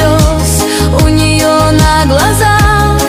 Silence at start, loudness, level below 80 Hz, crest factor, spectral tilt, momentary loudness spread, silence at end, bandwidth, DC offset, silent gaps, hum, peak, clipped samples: 0 s; -8 LUFS; -16 dBFS; 8 dB; -4.5 dB/octave; 3 LU; 0 s; 16.5 kHz; under 0.1%; none; none; 0 dBFS; under 0.1%